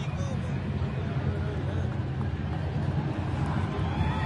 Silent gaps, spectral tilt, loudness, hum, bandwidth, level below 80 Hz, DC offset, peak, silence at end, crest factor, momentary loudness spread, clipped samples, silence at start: none; -8 dB/octave; -31 LUFS; none; 10.5 kHz; -42 dBFS; under 0.1%; -16 dBFS; 0 s; 14 dB; 2 LU; under 0.1%; 0 s